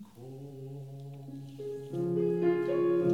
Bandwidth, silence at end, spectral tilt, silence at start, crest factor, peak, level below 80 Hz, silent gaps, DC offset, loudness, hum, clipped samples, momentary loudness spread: 6.6 kHz; 0 s; -9 dB/octave; 0 s; 16 dB; -16 dBFS; -72 dBFS; none; under 0.1%; -31 LUFS; none; under 0.1%; 17 LU